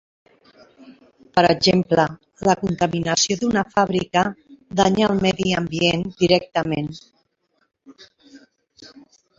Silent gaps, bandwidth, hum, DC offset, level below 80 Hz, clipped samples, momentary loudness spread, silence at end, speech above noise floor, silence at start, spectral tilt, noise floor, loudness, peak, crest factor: none; 7.8 kHz; none; under 0.1%; -52 dBFS; under 0.1%; 7 LU; 0.5 s; 49 dB; 0.8 s; -4.5 dB/octave; -68 dBFS; -20 LUFS; -2 dBFS; 20 dB